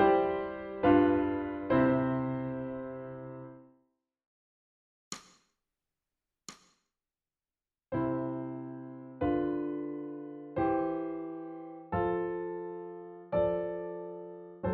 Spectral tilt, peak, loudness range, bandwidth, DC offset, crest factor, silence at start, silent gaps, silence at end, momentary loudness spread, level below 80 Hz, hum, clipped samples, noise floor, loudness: -6.5 dB/octave; -12 dBFS; 23 LU; 7.6 kHz; under 0.1%; 22 dB; 0 s; 4.26-5.11 s; 0 s; 19 LU; -58 dBFS; none; under 0.1%; under -90 dBFS; -32 LUFS